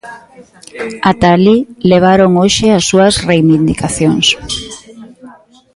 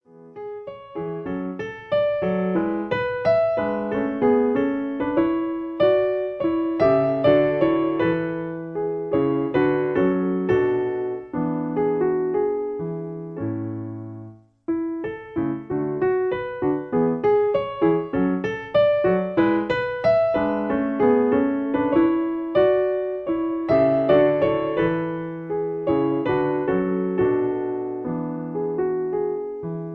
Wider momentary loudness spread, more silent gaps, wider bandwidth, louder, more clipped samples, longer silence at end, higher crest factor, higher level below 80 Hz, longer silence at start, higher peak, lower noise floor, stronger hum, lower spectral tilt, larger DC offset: first, 13 LU vs 10 LU; neither; first, 11.5 kHz vs 5.8 kHz; first, -10 LUFS vs -22 LUFS; neither; first, 0.45 s vs 0 s; second, 12 dB vs 18 dB; first, -36 dBFS vs -54 dBFS; about the same, 0.05 s vs 0.15 s; first, 0 dBFS vs -4 dBFS; second, -38 dBFS vs -42 dBFS; neither; second, -5 dB/octave vs -9 dB/octave; neither